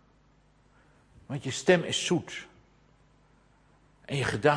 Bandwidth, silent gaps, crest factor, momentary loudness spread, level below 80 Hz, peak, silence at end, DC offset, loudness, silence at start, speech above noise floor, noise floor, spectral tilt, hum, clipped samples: 10.5 kHz; none; 24 dB; 17 LU; -62 dBFS; -8 dBFS; 0 s; under 0.1%; -29 LUFS; 1.3 s; 36 dB; -63 dBFS; -4.5 dB/octave; 50 Hz at -60 dBFS; under 0.1%